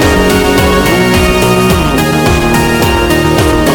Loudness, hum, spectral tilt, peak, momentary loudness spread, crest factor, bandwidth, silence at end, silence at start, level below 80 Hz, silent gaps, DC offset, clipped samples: -9 LUFS; none; -5 dB/octave; 0 dBFS; 1 LU; 8 dB; 18 kHz; 0 s; 0 s; -18 dBFS; none; under 0.1%; under 0.1%